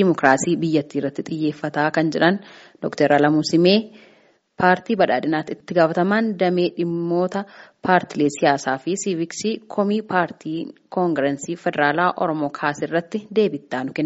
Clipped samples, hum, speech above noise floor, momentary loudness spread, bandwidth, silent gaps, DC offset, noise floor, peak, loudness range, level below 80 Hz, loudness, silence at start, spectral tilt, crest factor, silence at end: under 0.1%; none; 35 dB; 10 LU; 8 kHz; none; under 0.1%; -55 dBFS; 0 dBFS; 3 LU; -64 dBFS; -21 LUFS; 0 s; -4.5 dB/octave; 20 dB; 0 s